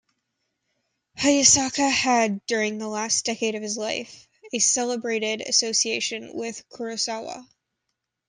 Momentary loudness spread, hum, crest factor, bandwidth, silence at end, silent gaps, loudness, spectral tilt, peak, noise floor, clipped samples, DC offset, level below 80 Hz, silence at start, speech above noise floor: 15 LU; none; 22 dB; 11 kHz; 0.85 s; none; -22 LUFS; -1 dB/octave; -2 dBFS; -81 dBFS; under 0.1%; under 0.1%; -62 dBFS; 1.15 s; 56 dB